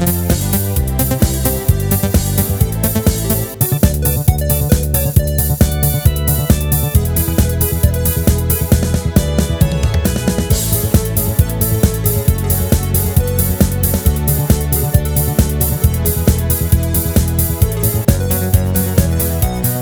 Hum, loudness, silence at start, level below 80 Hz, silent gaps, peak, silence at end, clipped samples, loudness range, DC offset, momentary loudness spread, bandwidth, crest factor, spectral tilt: none; -14 LUFS; 0 s; -20 dBFS; none; 0 dBFS; 0 s; under 0.1%; 1 LU; under 0.1%; 2 LU; over 20 kHz; 14 dB; -5.5 dB/octave